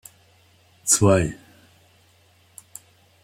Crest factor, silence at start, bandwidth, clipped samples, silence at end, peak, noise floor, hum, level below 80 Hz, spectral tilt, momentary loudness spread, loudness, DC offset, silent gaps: 22 dB; 0.85 s; 16.5 kHz; under 0.1%; 1.9 s; -4 dBFS; -58 dBFS; none; -52 dBFS; -4.5 dB/octave; 27 LU; -19 LUFS; under 0.1%; none